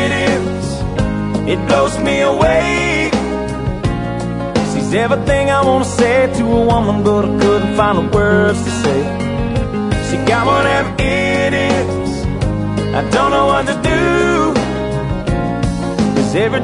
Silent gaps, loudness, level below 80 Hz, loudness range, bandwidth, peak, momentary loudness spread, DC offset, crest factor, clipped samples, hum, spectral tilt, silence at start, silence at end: none; -15 LUFS; -28 dBFS; 2 LU; 11 kHz; 0 dBFS; 6 LU; under 0.1%; 14 dB; under 0.1%; none; -6 dB/octave; 0 s; 0 s